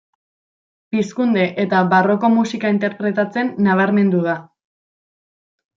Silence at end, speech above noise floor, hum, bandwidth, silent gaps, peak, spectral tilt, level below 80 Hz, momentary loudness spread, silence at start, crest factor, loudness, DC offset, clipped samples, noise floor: 1.35 s; over 74 dB; none; 7.4 kHz; none; -2 dBFS; -7 dB/octave; -66 dBFS; 7 LU; 0.95 s; 16 dB; -17 LUFS; under 0.1%; under 0.1%; under -90 dBFS